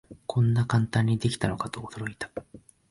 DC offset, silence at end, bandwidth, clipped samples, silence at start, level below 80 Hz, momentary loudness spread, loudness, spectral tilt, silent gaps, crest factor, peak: under 0.1%; 0.3 s; 11.5 kHz; under 0.1%; 0.1 s; -52 dBFS; 13 LU; -28 LUFS; -6.5 dB/octave; none; 18 dB; -10 dBFS